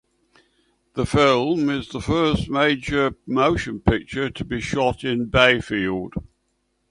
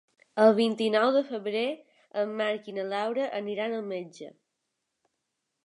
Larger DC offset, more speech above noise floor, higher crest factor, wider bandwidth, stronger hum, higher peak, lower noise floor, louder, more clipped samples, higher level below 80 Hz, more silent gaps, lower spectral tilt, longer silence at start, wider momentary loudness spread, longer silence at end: neither; second, 50 dB vs 55 dB; about the same, 20 dB vs 22 dB; about the same, 11 kHz vs 11 kHz; neither; first, 0 dBFS vs -8 dBFS; second, -70 dBFS vs -82 dBFS; first, -21 LUFS vs -28 LUFS; neither; first, -40 dBFS vs -84 dBFS; neither; about the same, -5.5 dB/octave vs -5.5 dB/octave; first, 0.95 s vs 0.35 s; second, 11 LU vs 15 LU; second, 0.65 s vs 1.35 s